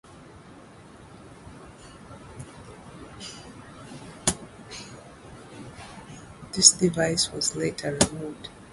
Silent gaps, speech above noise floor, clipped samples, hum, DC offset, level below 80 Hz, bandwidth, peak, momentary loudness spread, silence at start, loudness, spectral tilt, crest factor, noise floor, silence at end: none; 24 dB; under 0.1%; none; under 0.1%; -52 dBFS; 12 kHz; 0 dBFS; 25 LU; 0.1 s; -22 LUFS; -2.5 dB/octave; 30 dB; -48 dBFS; 0 s